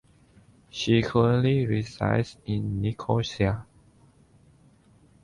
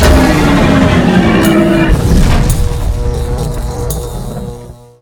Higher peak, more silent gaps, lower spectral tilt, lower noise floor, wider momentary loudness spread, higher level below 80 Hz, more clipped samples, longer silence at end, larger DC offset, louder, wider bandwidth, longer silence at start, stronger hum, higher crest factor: second, -10 dBFS vs 0 dBFS; neither; about the same, -7 dB/octave vs -6 dB/octave; first, -58 dBFS vs -30 dBFS; second, 9 LU vs 13 LU; second, -50 dBFS vs -16 dBFS; second, under 0.1% vs 0.5%; first, 1.6 s vs 0.3 s; neither; second, -26 LUFS vs -11 LUFS; second, 10.5 kHz vs over 20 kHz; first, 0.75 s vs 0 s; neither; first, 18 dB vs 10 dB